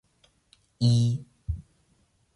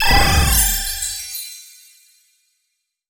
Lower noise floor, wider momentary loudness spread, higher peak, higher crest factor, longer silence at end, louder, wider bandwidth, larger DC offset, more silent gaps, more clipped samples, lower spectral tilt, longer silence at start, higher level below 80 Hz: second, -67 dBFS vs -73 dBFS; second, 14 LU vs 17 LU; second, -12 dBFS vs -2 dBFS; about the same, 18 dB vs 18 dB; second, 0.75 s vs 1.45 s; second, -27 LUFS vs -17 LUFS; second, 11 kHz vs over 20 kHz; neither; neither; neither; first, -7 dB/octave vs -2 dB/octave; first, 0.8 s vs 0 s; second, -44 dBFS vs -24 dBFS